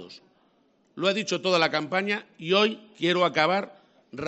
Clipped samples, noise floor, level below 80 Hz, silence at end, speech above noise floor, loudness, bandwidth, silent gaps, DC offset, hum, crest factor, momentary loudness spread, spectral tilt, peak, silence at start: under 0.1%; -65 dBFS; -70 dBFS; 0 s; 40 dB; -25 LUFS; 8.2 kHz; none; under 0.1%; none; 22 dB; 7 LU; -4 dB/octave; -6 dBFS; 0 s